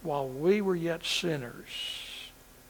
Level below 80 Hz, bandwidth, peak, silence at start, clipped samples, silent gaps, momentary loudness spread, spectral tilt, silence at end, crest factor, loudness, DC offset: -60 dBFS; 20 kHz; -14 dBFS; 0 s; under 0.1%; none; 14 LU; -4.5 dB/octave; 0 s; 18 dB; -31 LUFS; under 0.1%